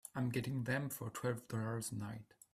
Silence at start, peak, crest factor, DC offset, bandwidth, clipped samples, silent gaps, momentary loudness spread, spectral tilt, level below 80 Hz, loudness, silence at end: 0.05 s; -24 dBFS; 16 dB; under 0.1%; 15.5 kHz; under 0.1%; none; 7 LU; -5.5 dB/octave; -72 dBFS; -41 LUFS; 0.3 s